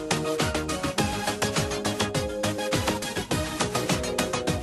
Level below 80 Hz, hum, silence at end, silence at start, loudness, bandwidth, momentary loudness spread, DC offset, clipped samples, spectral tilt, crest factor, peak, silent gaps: -44 dBFS; none; 0 s; 0 s; -27 LUFS; 12.5 kHz; 2 LU; under 0.1%; under 0.1%; -4 dB/octave; 20 dB; -6 dBFS; none